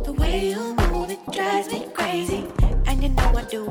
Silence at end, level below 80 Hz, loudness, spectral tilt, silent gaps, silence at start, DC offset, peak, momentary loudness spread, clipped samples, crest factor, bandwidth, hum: 0 s; -24 dBFS; -24 LUFS; -5.5 dB/octave; none; 0 s; under 0.1%; -6 dBFS; 4 LU; under 0.1%; 16 dB; 15.5 kHz; none